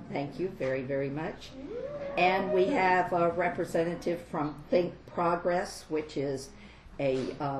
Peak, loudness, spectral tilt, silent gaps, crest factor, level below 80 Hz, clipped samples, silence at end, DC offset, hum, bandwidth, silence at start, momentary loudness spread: -14 dBFS; -30 LUFS; -6 dB/octave; none; 18 dB; -56 dBFS; under 0.1%; 0 s; under 0.1%; none; 13 kHz; 0 s; 13 LU